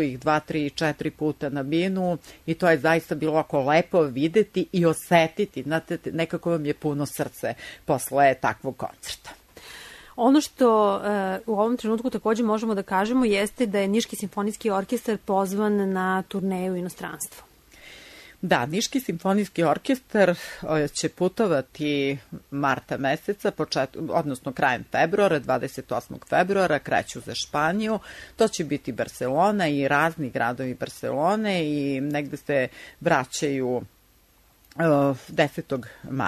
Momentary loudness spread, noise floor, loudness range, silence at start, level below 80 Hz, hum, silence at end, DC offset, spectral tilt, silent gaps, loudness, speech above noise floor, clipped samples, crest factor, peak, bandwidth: 11 LU; -59 dBFS; 4 LU; 0 s; -58 dBFS; none; 0 s; under 0.1%; -5.5 dB/octave; none; -25 LUFS; 35 dB; under 0.1%; 18 dB; -6 dBFS; 13.5 kHz